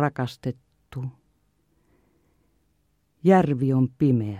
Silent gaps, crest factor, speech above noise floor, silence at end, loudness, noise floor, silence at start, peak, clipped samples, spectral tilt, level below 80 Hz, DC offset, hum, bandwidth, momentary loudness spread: none; 20 dB; 47 dB; 0 s; -23 LUFS; -69 dBFS; 0 s; -6 dBFS; under 0.1%; -9 dB/octave; -60 dBFS; under 0.1%; 50 Hz at -60 dBFS; 10.5 kHz; 18 LU